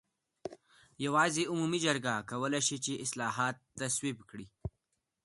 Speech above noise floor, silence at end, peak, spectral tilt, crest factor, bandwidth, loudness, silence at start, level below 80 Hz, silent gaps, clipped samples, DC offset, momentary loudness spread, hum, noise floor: 49 dB; 0.55 s; -14 dBFS; -3 dB/octave; 22 dB; 12 kHz; -33 LUFS; 0.45 s; -62 dBFS; none; under 0.1%; under 0.1%; 18 LU; none; -83 dBFS